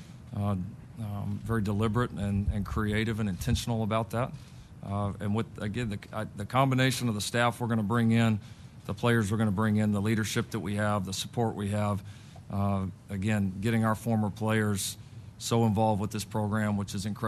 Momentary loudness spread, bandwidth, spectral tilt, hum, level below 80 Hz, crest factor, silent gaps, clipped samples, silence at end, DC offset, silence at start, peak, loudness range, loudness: 11 LU; 13.5 kHz; -6 dB/octave; none; -48 dBFS; 18 dB; none; under 0.1%; 0 s; under 0.1%; 0 s; -10 dBFS; 4 LU; -30 LUFS